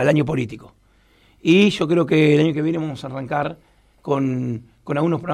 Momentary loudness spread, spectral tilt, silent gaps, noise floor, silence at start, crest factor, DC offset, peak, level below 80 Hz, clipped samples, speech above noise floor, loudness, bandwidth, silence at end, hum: 15 LU; -7 dB/octave; none; -56 dBFS; 0 s; 16 dB; under 0.1%; -4 dBFS; -54 dBFS; under 0.1%; 37 dB; -20 LUFS; 11.5 kHz; 0 s; none